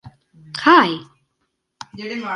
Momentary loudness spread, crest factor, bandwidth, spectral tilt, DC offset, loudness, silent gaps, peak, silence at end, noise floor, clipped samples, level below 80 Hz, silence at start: 20 LU; 20 dB; 11.5 kHz; -4.5 dB/octave; under 0.1%; -15 LUFS; none; 0 dBFS; 0 s; -73 dBFS; under 0.1%; -62 dBFS; 0.05 s